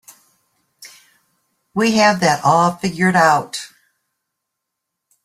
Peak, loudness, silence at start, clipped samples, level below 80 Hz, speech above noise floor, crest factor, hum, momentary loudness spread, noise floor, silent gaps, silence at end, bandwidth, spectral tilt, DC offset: -2 dBFS; -15 LUFS; 0.8 s; under 0.1%; -58 dBFS; 64 dB; 18 dB; none; 15 LU; -79 dBFS; none; 1.6 s; 15 kHz; -4.5 dB/octave; under 0.1%